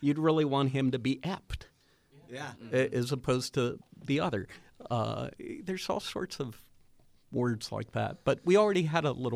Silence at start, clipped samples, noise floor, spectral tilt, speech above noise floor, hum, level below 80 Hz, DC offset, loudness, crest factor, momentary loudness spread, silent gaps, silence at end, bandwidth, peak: 0 s; under 0.1%; -63 dBFS; -6 dB/octave; 32 dB; none; -56 dBFS; under 0.1%; -31 LUFS; 20 dB; 15 LU; none; 0 s; 15 kHz; -12 dBFS